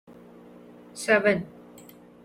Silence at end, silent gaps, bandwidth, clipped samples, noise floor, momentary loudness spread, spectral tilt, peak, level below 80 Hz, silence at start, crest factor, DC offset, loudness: 0.75 s; none; 16 kHz; under 0.1%; -50 dBFS; 23 LU; -4.5 dB/octave; -8 dBFS; -66 dBFS; 0.95 s; 20 dB; under 0.1%; -24 LUFS